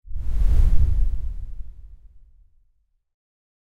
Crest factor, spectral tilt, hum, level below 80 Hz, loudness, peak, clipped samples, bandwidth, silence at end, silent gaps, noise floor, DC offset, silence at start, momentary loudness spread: 16 dB; -8 dB/octave; none; -22 dBFS; -25 LUFS; -4 dBFS; under 0.1%; 2.5 kHz; 0.95 s; none; -65 dBFS; under 0.1%; 0.1 s; 20 LU